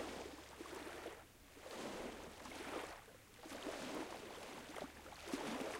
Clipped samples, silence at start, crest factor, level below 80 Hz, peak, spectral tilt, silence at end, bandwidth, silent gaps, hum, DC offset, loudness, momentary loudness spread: under 0.1%; 0 s; 20 dB; -68 dBFS; -30 dBFS; -3.5 dB/octave; 0 s; 16 kHz; none; none; under 0.1%; -50 LUFS; 10 LU